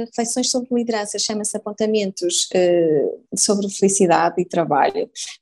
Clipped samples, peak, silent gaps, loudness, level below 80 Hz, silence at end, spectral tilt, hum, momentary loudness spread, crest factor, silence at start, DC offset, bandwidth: under 0.1%; -2 dBFS; none; -19 LUFS; -66 dBFS; 0.05 s; -3.5 dB/octave; none; 7 LU; 18 dB; 0 s; under 0.1%; 13 kHz